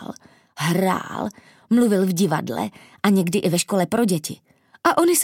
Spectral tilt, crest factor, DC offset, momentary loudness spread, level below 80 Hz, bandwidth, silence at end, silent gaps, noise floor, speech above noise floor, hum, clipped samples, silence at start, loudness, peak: -5 dB/octave; 20 dB; under 0.1%; 12 LU; -66 dBFS; 17 kHz; 0 s; none; -41 dBFS; 21 dB; none; under 0.1%; 0 s; -21 LUFS; -2 dBFS